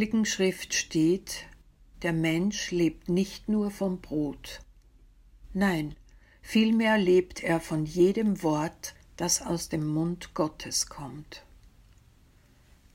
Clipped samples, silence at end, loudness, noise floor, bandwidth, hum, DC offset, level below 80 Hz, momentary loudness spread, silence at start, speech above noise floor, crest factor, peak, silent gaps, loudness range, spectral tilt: under 0.1%; 1.55 s; -28 LUFS; -59 dBFS; 16 kHz; none; under 0.1%; -52 dBFS; 15 LU; 0 s; 32 dB; 18 dB; -12 dBFS; none; 6 LU; -4.5 dB/octave